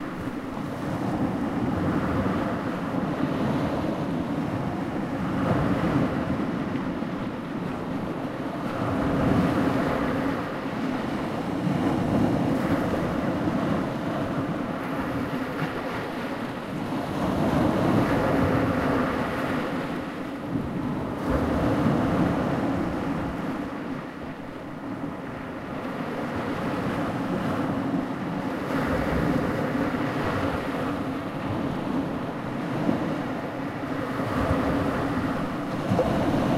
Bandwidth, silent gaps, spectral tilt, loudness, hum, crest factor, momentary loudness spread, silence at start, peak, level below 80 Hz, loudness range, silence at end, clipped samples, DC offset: 15.5 kHz; none; -7.5 dB/octave; -27 LUFS; none; 18 dB; 8 LU; 0 s; -8 dBFS; -44 dBFS; 4 LU; 0 s; under 0.1%; under 0.1%